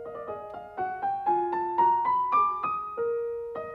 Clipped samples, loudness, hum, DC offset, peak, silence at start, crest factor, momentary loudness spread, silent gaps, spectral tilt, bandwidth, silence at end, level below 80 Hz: under 0.1%; -27 LUFS; none; under 0.1%; -14 dBFS; 0 s; 14 dB; 14 LU; none; -7.5 dB/octave; 5.2 kHz; 0 s; -66 dBFS